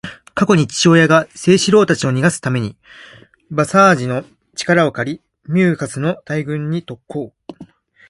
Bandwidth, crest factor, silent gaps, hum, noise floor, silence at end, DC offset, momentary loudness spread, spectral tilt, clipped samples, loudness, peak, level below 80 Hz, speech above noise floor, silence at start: 11.5 kHz; 16 dB; none; none; -42 dBFS; 0.45 s; under 0.1%; 16 LU; -5.5 dB/octave; under 0.1%; -15 LUFS; 0 dBFS; -52 dBFS; 27 dB; 0.05 s